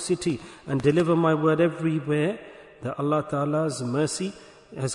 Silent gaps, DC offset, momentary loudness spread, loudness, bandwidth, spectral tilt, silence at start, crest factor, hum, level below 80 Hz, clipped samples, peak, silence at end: none; under 0.1%; 13 LU; -25 LUFS; 11 kHz; -6 dB/octave; 0 s; 16 dB; none; -60 dBFS; under 0.1%; -8 dBFS; 0 s